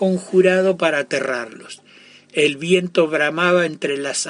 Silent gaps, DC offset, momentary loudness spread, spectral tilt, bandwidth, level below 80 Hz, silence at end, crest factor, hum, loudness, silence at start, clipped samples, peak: none; under 0.1%; 14 LU; -4.5 dB/octave; 11 kHz; -66 dBFS; 0 s; 16 dB; none; -18 LUFS; 0 s; under 0.1%; -4 dBFS